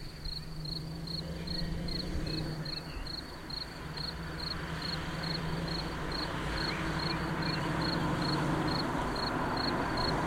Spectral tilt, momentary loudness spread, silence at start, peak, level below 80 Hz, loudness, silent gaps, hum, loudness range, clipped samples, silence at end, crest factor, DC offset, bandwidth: -5.5 dB/octave; 8 LU; 0 s; -20 dBFS; -44 dBFS; -35 LUFS; none; none; 5 LU; under 0.1%; 0 s; 16 dB; under 0.1%; 16.5 kHz